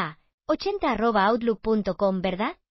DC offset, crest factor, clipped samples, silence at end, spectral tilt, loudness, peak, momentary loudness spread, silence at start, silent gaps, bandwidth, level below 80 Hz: under 0.1%; 16 dB; under 0.1%; 0.15 s; -4.5 dB/octave; -25 LUFS; -10 dBFS; 8 LU; 0 s; 0.34-0.38 s; 6 kHz; -50 dBFS